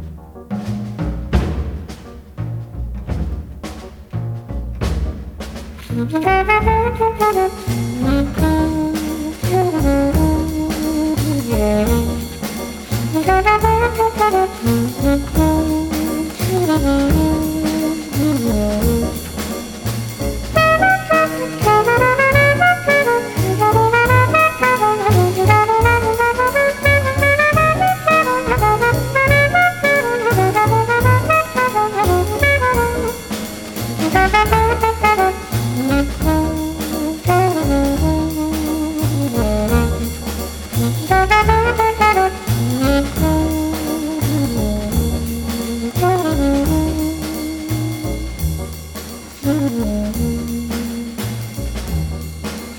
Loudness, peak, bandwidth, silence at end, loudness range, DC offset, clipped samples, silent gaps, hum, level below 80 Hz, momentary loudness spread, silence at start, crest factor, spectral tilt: -16 LUFS; 0 dBFS; over 20 kHz; 0 s; 8 LU; under 0.1%; under 0.1%; none; none; -26 dBFS; 13 LU; 0 s; 16 dB; -5.5 dB/octave